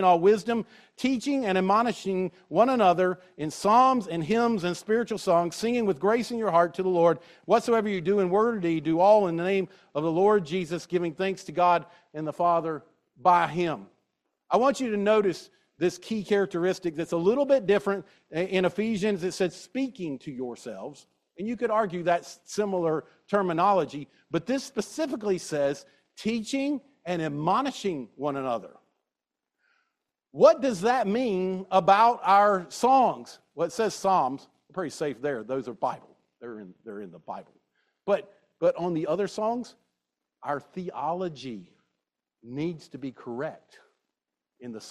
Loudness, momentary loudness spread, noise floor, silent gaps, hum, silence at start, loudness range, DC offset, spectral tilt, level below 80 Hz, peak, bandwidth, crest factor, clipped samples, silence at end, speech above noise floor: -26 LUFS; 17 LU; -88 dBFS; none; none; 0 s; 10 LU; under 0.1%; -5.5 dB/octave; -68 dBFS; -6 dBFS; 13.5 kHz; 20 dB; under 0.1%; 0 s; 62 dB